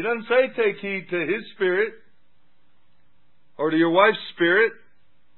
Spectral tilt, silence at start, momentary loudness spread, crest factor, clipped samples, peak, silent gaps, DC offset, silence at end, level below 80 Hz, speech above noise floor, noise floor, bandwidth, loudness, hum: -9.5 dB/octave; 0 s; 9 LU; 22 dB; under 0.1%; -2 dBFS; none; 0.5%; 0.65 s; -76 dBFS; 46 dB; -68 dBFS; 4.3 kHz; -22 LUFS; none